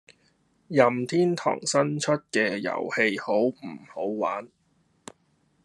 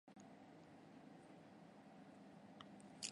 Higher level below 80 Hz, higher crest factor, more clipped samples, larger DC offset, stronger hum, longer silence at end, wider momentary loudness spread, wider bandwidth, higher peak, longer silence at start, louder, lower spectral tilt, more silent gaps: first, -74 dBFS vs under -90 dBFS; second, 22 dB vs 34 dB; neither; neither; neither; first, 1.2 s vs 0 s; first, 10 LU vs 3 LU; about the same, 12 kHz vs 11 kHz; first, -4 dBFS vs -26 dBFS; first, 0.7 s vs 0.05 s; first, -25 LUFS vs -61 LUFS; first, -4.5 dB/octave vs -3 dB/octave; neither